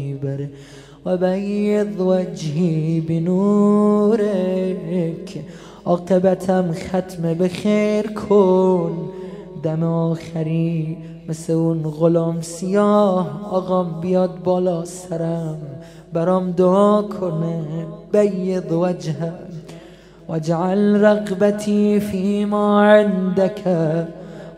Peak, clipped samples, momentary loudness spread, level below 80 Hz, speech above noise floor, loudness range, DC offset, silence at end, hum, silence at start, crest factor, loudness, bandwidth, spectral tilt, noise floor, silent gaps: 0 dBFS; under 0.1%; 14 LU; -54 dBFS; 24 dB; 4 LU; under 0.1%; 0 s; none; 0 s; 18 dB; -19 LUFS; 13 kHz; -7.5 dB/octave; -42 dBFS; none